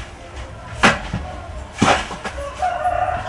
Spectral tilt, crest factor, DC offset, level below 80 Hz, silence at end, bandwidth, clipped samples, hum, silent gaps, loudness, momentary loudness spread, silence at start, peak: -4 dB/octave; 22 dB; under 0.1%; -36 dBFS; 0 s; 11.5 kHz; under 0.1%; none; none; -20 LUFS; 18 LU; 0 s; 0 dBFS